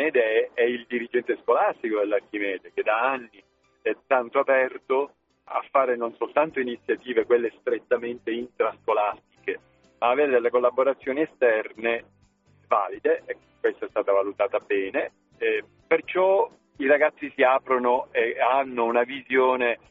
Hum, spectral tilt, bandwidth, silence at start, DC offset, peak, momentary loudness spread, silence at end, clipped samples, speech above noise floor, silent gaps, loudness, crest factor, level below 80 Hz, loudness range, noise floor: none; -1.5 dB/octave; 4 kHz; 0 s; under 0.1%; -6 dBFS; 9 LU; 0.15 s; under 0.1%; 37 dB; none; -24 LUFS; 20 dB; -70 dBFS; 4 LU; -61 dBFS